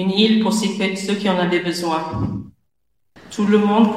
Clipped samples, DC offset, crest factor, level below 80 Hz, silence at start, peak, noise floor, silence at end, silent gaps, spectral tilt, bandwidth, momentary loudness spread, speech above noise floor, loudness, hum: under 0.1%; 0.1%; 16 dB; -48 dBFS; 0 s; -2 dBFS; -74 dBFS; 0 s; none; -5.5 dB/octave; 14 kHz; 10 LU; 57 dB; -19 LUFS; none